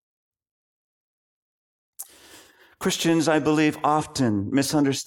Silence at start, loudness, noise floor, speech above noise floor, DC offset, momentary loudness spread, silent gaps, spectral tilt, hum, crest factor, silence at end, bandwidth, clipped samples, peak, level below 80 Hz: 2 s; -22 LUFS; -52 dBFS; 30 dB; under 0.1%; 20 LU; none; -4.5 dB/octave; none; 18 dB; 0.05 s; 18.5 kHz; under 0.1%; -8 dBFS; -62 dBFS